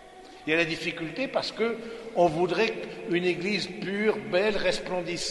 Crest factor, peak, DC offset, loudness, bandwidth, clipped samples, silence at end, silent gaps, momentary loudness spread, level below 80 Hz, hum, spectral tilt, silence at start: 18 dB; -10 dBFS; under 0.1%; -28 LUFS; 11.5 kHz; under 0.1%; 0 s; none; 7 LU; -56 dBFS; none; -4.5 dB/octave; 0 s